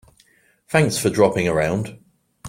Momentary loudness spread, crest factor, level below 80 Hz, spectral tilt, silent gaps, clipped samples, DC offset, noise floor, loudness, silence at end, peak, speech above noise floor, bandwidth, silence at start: 8 LU; 20 dB; -50 dBFS; -5 dB/octave; none; under 0.1%; under 0.1%; -58 dBFS; -19 LUFS; 0 s; -2 dBFS; 39 dB; 16.5 kHz; 0.7 s